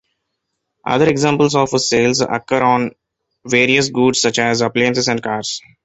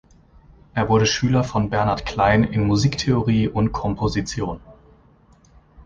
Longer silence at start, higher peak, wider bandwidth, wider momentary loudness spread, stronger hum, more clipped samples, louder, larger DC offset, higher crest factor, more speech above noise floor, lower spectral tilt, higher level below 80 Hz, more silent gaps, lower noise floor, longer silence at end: about the same, 0.85 s vs 0.75 s; first, 0 dBFS vs -4 dBFS; first, 8.4 kHz vs 7.6 kHz; about the same, 7 LU vs 9 LU; neither; neither; first, -15 LUFS vs -20 LUFS; neither; about the same, 16 dB vs 18 dB; first, 59 dB vs 34 dB; second, -4 dB/octave vs -6 dB/octave; second, -54 dBFS vs -38 dBFS; neither; first, -74 dBFS vs -53 dBFS; first, 0.25 s vs 0 s